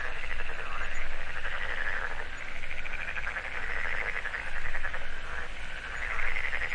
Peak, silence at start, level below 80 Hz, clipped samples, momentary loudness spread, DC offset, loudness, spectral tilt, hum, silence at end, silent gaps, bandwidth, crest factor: -14 dBFS; 0 s; -36 dBFS; under 0.1%; 7 LU; under 0.1%; -35 LUFS; -3 dB/octave; none; 0 s; none; 7.6 kHz; 14 dB